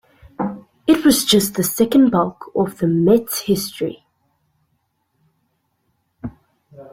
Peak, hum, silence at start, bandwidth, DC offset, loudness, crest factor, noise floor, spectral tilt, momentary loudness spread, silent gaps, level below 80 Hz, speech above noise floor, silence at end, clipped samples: -2 dBFS; none; 0.4 s; 16.5 kHz; under 0.1%; -17 LUFS; 18 dB; -68 dBFS; -4.5 dB/octave; 13 LU; none; -52 dBFS; 52 dB; 0.1 s; under 0.1%